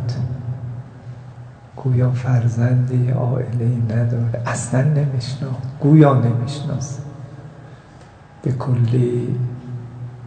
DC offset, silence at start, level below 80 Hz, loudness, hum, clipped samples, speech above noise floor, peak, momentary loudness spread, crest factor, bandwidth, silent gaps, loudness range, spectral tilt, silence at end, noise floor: under 0.1%; 0 s; -52 dBFS; -19 LUFS; none; under 0.1%; 25 dB; 0 dBFS; 20 LU; 18 dB; 9.2 kHz; none; 6 LU; -8 dB/octave; 0 s; -42 dBFS